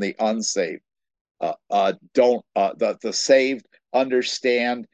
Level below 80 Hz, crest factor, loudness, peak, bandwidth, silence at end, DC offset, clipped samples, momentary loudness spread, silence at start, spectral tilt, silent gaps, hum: -74 dBFS; 18 dB; -22 LUFS; -4 dBFS; 9.2 kHz; 0.1 s; under 0.1%; under 0.1%; 11 LU; 0 s; -3 dB/octave; 1.21-1.25 s, 1.31-1.35 s; none